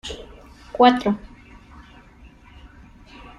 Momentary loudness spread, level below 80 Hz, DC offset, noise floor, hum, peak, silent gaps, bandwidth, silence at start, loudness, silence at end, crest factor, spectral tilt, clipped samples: 22 LU; -48 dBFS; under 0.1%; -48 dBFS; none; -2 dBFS; none; 11 kHz; 0.05 s; -18 LUFS; 2.1 s; 22 dB; -5.5 dB/octave; under 0.1%